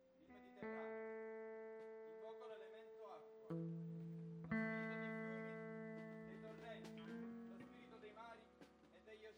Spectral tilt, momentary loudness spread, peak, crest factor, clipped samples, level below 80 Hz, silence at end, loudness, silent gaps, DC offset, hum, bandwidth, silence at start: -8 dB/octave; 14 LU; -32 dBFS; 20 dB; under 0.1%; -84 dBFS; 0 s; -52 LUFS; none; under 0.1%; none; 10 kHz; 0 s